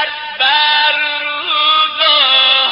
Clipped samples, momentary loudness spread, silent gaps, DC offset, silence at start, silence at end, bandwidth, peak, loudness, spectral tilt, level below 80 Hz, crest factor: under 0.1%; 8 LU; none; under 0.1%; 0 s; 0 s; 5.8 kHz; 0 dBFS; -10 LUFS; 5.5 dB/octave; -60 dBFS; 12 dB